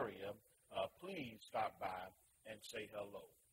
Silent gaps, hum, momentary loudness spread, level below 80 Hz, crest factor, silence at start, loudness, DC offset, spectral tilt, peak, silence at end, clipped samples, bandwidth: none; none; 13 LU; -80 dBFS; 18 dB; 0 s; -49 LUFS; under 0.1%; -4.5 dB/octave; -30 dBFS; 0.2 s; under 0.1%; 16 kHz